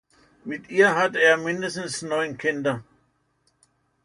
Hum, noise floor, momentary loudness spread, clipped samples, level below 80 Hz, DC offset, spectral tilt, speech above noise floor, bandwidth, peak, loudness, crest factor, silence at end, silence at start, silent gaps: none; -68 dBFS; 16 LU; under 0.1%; -68 dBFS; under 0.1%; -4 dB/octave; 46 dB; 11 kHz; -6 dBFS; -22 LUFS; 20 dB; 1.25 s; 0.45 s; none